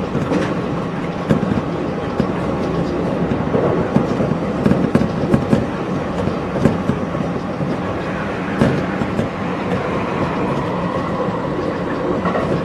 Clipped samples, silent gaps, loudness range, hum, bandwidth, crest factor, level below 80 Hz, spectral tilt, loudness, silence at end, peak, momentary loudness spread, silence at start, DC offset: under 0.1%; none; 3 LU; none; 12 kHz; 18 dB; -38 dBFS; -8 dB/octave; -19 LUFS; 0 s; 0 dBFS; 5 LU; 0 s; under 0.1%